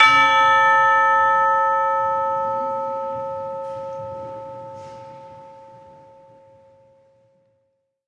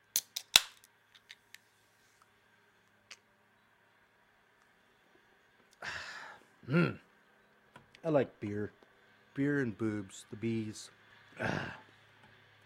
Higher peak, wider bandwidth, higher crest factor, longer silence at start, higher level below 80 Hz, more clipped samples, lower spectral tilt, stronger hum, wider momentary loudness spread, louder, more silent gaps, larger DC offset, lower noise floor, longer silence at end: about the same, 0 dBFS vs -2 dBFS; second, 10 kHz vs 16 kHz; second, 20 dB vs 36 dB; second, 0 s vs 0.15 s; first, -66 dBFS vs -72 dBFS; neither; about the same, -2.5 dB/octave vs -3.5 dB/octave; neither; second, 22 LU vs 27 LU; first, -18 LUFS vs -34 LUFS; neither; neither; about the same, -70 dBFS vs -69 dBFS; first, 2.45 s vs 0.85 s